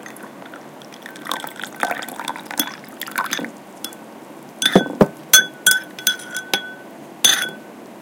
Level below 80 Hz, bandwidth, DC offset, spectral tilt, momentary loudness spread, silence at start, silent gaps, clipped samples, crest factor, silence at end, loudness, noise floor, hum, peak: -54 dBFS; 17 kHz; under 0.1%; -1.5 dB/octave; 23 LU; 0 s; none; under 0.1%; 22 dB; 0 s; -18 LUFS; -39 dBFS; none; 0 dBFS